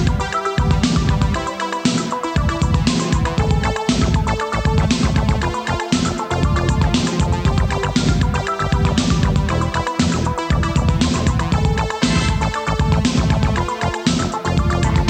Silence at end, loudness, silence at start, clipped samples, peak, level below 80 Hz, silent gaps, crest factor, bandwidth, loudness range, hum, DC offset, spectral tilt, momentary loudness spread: 0 s; -18 LUFS; 0 s; under 0.1%; -2 dBFS; -24 dBFS; none; 16 dB; 9.6 kHz; 1 LU; none; under 0.1%; -5.5 dB/octave; 3 LU